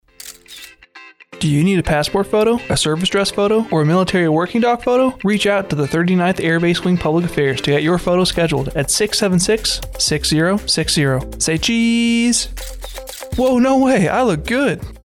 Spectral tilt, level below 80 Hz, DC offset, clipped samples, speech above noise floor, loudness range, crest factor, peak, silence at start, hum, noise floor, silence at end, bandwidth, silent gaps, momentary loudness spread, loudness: -4.5 dB/octave; -36 dBFS; under 0.1%; under 0.1%; 26 dB; 1 LU; 10 dB; -6 dBFS; 0.25 s; none; -42 dBFS; 0.05 s; 18.5 kHz; none; 5 LU; -16 LUFS